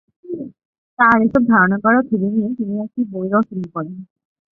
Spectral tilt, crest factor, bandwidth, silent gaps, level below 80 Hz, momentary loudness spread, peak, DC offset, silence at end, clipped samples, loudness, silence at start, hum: -10 dB/octave; 16 dB; 4 kHz; 0.65-0.97 s; -54 dBFS; 17 LU; -2 dBFS; under 0.1%; 0.5 s; under 0.1%; -17 LUFS; 0.25 s; none